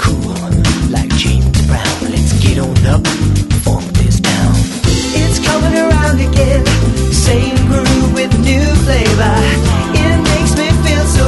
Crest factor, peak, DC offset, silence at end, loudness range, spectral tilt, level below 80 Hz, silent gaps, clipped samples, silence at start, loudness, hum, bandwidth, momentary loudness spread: 10 dB; 0 dBFS; under 0.1%; 0 s; 1 LU; -5 dB/octave; -16 dBFS; none; under 0.1%; 0 s; -12 LUFS; none; 12 kHz; 3 LU